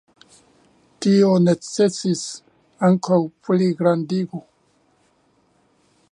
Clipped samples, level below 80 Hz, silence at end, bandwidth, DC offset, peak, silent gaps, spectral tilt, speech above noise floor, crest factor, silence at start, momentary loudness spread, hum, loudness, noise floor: under 0.1%; -68 dBFS; 1.7 s; 11 kHz; under 0.1%; -4 dBFS; none; -6.5 dB/octave; 44 dB; 18 dB; 1 s; 12 LU; none; -19 LUFS; -62 dBFS